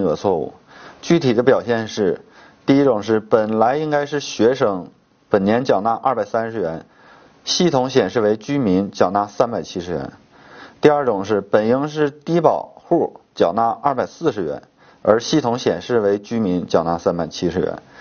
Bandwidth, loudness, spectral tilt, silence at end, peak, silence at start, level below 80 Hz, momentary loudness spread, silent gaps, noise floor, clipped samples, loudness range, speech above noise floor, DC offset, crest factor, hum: 6.8 kHz; -19 LUFS; -5.5 dB/octave; 0.2 s; 0 dBFS; 0 s; -54 dBFS; 10 LU; none; -48 dBFS; under 0.1%; 2 LU; 30 dB; under 0.1%; 18 dB; none